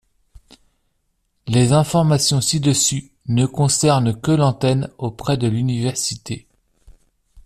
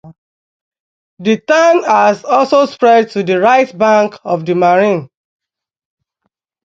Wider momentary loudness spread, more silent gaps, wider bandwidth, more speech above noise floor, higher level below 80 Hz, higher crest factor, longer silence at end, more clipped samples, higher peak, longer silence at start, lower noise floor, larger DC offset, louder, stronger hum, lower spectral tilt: first, 11 LU vs 7 LU; second, none vs 0.18-0.71 s, 0.80-1.17 s; first, 14 kHz vs 7.6 kHz; second, 51 dB vs 59 dB; first, -48 dBFS vs -62 dBFS; about the same, 16 dB vs 14 dB; second, 0.05 s vs 1.6 s; neither; about the same, -2 dBFS vs 0 dBFS; first, 1.45 s vs 0.05 s; about the same, -68 dBFS vs -70 dBFS; neither; second, -18 LUFS vs -11 LUFS; neither; about the same, -5 dB/octave vs -5.5 dB/octave